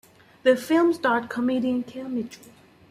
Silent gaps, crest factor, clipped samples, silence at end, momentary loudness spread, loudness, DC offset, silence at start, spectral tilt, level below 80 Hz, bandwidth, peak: none; 18 dB; under 0.1%; 0.55 s; 11 LU; -24 LUFS; under 0.1%; 0.45 s; -5 dB/octave; -68 dBFS; 15 kHz; -6 dBFS